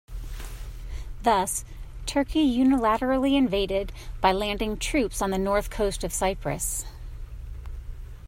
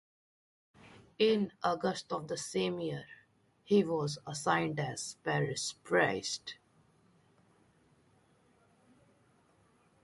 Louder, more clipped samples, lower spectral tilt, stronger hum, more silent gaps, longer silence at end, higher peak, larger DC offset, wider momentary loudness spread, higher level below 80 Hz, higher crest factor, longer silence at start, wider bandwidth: first, -25 LUFS vs -33 LUFS; neither; about the same, -4 dB/octave vs -4.5 dB/octave; neither; neither; second, 0 s vs 3.5 s; first, -8 dBFS vs -14 dBFS; neither; first, 19 LU vs 10 LU; first, -36 dBFS vs -74 dBFS; about the same, 18 dB vs 22 dB; second, 0.1 s vs 0.85 s; first, 16.5 kHz vs 11.5 kHz